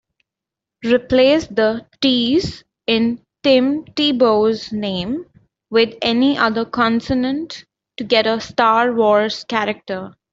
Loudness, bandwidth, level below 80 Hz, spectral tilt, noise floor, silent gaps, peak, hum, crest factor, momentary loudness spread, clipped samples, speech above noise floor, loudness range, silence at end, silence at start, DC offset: -17 LUFS; 7.8 kHz; -50 dBFS; -5 dB/octave; -85 dBFS; none; -2 dBFS; none; 16 dB; 12 LU; under 0.1%; 69 dB; 2 LU; 0.25 s; 0.85 s; under 0.1%